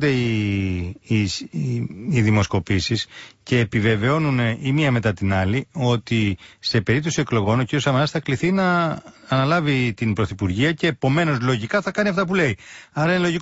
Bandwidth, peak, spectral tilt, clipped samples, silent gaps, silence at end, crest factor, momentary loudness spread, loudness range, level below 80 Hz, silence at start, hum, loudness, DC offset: 8 kHz; -6 dBFS; -6 dB/octave; under 0.1%; none; 0 s; 14 dB; 7 LU; 1 LU; -48 dBFS; 0 s; none; -21 LUFS; under 0.1%